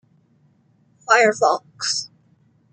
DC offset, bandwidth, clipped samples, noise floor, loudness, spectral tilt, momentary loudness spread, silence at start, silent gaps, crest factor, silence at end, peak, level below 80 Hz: under 0.1%; 9.6 kHz; under 0.1%; -59 dBFS; -19 LUFS; -1.5 dB/octave; 19 LU; 1.1 s; none; 22 dB; 0.65 s; -2 dBFS; -78 dBFS